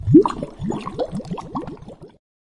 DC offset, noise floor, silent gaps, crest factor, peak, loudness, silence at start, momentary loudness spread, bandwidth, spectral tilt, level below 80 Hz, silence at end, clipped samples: under 0.1%; -39 dBFS; none; 20 dB; -2 dBFS; -22 LUFS; 0 s; 22 LU; 10.5 kHz; -9 dB/octave; -44 dBFS; 0.4 s; under 0.1%